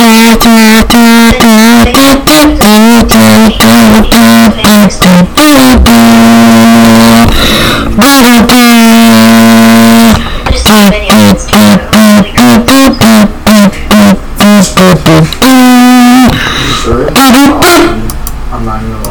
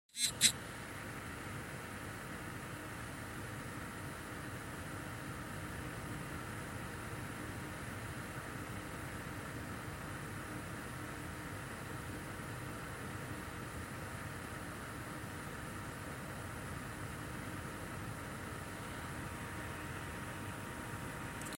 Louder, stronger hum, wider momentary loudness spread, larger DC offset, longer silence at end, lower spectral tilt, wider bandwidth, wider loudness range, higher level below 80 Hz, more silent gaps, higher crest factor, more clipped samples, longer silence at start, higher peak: first, -2 LUFS vs -43 LUFS; neither; first, 6 LU vs 1 LU; first, 3% vs under 0.1%; about the same, 0 s vs 0 s; first, -4.5 dB/octave vs -3 dB/octave; first, 19.5 kHz vs 16.5 kHz; about the same, 2 LU vs 1 LU; first, -16 dBFS vs -58 dBFS; neither; second, 2 dB vs 34 dB; first, 6% vs under 0.1%; second, 0 s vs 0.15 s; first, 0 dBFS vs -10 dBFS